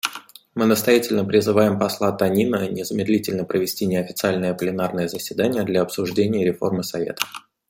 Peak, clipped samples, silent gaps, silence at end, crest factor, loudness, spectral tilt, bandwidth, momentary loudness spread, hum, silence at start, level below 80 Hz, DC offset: 0 dBFS; under 0.1%; none; 0.3 s; 22 dB; -21 LUFS; -5 dB/octave; 16.5 kHz; 8 LU; none; 0.05 s; -60 dBFS; under 0.1%